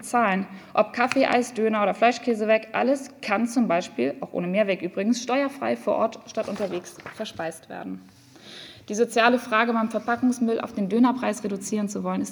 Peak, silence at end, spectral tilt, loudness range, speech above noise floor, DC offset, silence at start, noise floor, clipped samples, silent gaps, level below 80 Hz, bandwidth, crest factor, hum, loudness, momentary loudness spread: -4 dBFS; 0 s; -5 dB/octave; 6 LU; 21 dB; under 0.1%; 0 s; -45 dBFS; under 0.1%; none; -70 dBFS; over 20 kHz; 20 dB; none; -24 LUFS; 13 LU